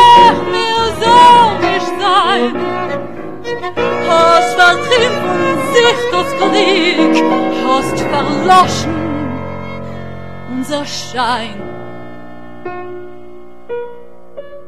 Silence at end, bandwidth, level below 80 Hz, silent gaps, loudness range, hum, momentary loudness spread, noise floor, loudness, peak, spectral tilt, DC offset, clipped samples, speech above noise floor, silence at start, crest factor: 0.05 s; 14 kHz; -44 dBFS; none; 11 LU; none; 19 LU; -36 dBFS; -12 LUFS; 0 dBFS; -4 dB/octave; 3%; under 0.1%; 23 dB; 0 s; 14 dB